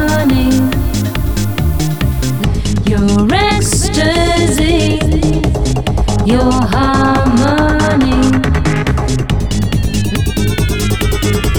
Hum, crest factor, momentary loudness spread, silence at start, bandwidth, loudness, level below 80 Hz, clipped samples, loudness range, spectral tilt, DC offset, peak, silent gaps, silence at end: none; 10 dB; 4 LU; 0 s; over 20 kHz; -13 LUFS; -18 dBFS; under 0.1%; 2 LU; -5.5 dB/octave; 4%; -2 dBFS; none; 0 s